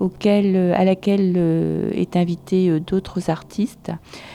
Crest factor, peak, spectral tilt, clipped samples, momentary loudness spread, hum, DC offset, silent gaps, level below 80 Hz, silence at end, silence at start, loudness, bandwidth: 12 dB; -6 dBFS; -8 dB/octave; under 0.1%; 9 LU; none; under 0.1%; none; -50 dBFS; 0 s; 0 s; -19 LUFS; 11.5 kHz